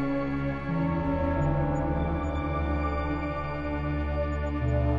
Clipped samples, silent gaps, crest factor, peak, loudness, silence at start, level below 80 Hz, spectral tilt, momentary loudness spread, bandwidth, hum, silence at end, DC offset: under 0.1%; none; 12 dB; -14 dBFS; -29 LUFS; 0 s; -34 dBFS; -9 dB/octave; 4 LU; 7.4 kHz; none; 0 s; under 0.1%